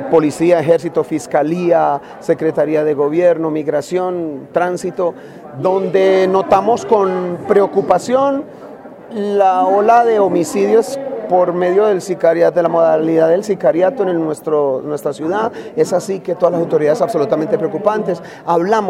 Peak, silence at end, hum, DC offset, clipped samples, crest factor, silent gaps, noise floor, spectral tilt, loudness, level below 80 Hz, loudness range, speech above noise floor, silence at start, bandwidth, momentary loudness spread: 0 dBFS; 0 s; none; under 0.1%; under 0.1%; 14 dB; none; -34 dBFS; -6.5 dB/octave; -15 LUFS; -60 dBFS; 3 LU; 20 dB; 0 s; 14.5 kHz; 8 LU